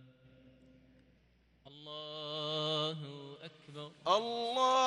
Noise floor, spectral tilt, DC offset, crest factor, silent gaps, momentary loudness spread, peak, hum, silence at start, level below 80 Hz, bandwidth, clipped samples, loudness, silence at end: -69 dBFS; -4 dB/octave; under 0.1%; 22 dB; none; 18 LU; -16 dBFS; none; 0 s; -76 dBFS; 11 kHz; under 0.1%; -36 LUFS; 0 s